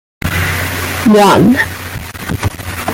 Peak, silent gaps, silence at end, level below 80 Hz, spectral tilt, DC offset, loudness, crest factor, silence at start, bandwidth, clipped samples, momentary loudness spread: 0 dBFS; none; 0 s; -34 dBFS; -5 dB/octave; under 0.1%; -12 LUFS; 12 dB; 0.25 s; 17 kHz; under 0.1%; 15 LU